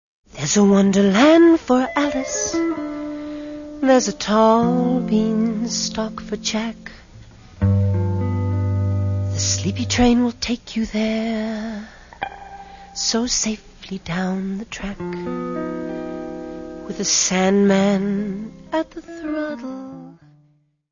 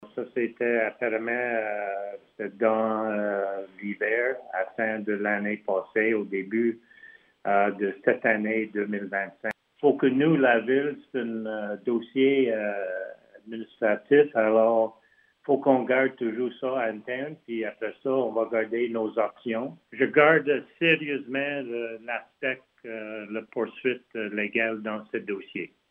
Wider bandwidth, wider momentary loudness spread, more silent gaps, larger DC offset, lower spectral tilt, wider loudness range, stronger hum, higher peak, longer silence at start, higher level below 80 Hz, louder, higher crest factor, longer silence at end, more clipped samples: first, 7.4 kHz vs 3.9 kHz; first, 17 LU vs 13 LU; neither; neither; second, -5 dB/octave vs -8.5 dB/octave; about the same, 7 LU vs 5 LU; neither; first, -2 dBFS vs -6 dBFS; first, 0.35 s vs 0 s; first, -44 dBFS vs -82 dBFS; first, -19 LUFS vs -26 LUFS; about the same, 18 dB vs 22 dB; first, 0.8 s vs 0.25 s; neither